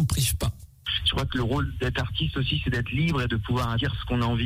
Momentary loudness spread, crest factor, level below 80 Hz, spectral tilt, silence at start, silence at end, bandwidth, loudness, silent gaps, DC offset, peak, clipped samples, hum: 4 LU; 14 dB; -36 dBFS; -4.5 dB/octave; 0 s; 0 s; 16 kHz; -26 LUFS; none; under 0.1%; -12 dBFS; under 0.1%; none